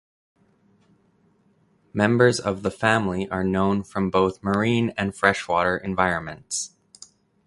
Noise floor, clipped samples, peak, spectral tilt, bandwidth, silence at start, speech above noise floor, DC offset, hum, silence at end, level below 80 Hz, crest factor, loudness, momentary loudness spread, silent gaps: -62 dBFS; under 0.1%; -2 dBFS; -5 dB/octave; 11.5 kHz; 1.95 s; 40 dB; under 0.1%; none; 0.8 s; -50 dBFS; 22 dB; -23 LUFS; 10 LU; none